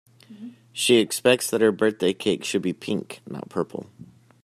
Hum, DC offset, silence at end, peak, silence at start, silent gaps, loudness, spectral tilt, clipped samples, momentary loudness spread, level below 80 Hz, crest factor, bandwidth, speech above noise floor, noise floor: none; under 0.1%; 0.4 s; -4 dBFS; 0.3 s; none; -23 LUFS; -4 dB/octave; under 0.1%; 18 LU; -68 dBFS; 20 dB; 15.5 kHz; 19 dB; -43 dBFS